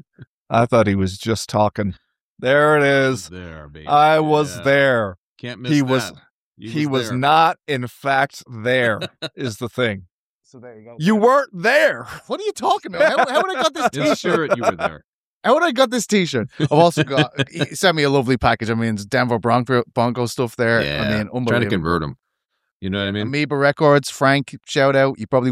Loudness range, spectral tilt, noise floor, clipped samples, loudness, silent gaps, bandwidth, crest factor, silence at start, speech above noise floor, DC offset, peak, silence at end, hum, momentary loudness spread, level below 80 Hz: 3 LU; -5.5 dB/octave; -75 dBFS; under 0.1%; -18 LUFS; 0.27-0.46 s, 2.21-2.36 s, 5.18-5.36 s, 6.31-6.53 s, 10.11-10.41 s, 15.04-15.41 s, 22.72-22.80 s; 16 kHz; 18 dB; 0.2 s; 57 dB; under 0.1%; -2 dBFS; 0 s; none; 11 LU; -50 dBFS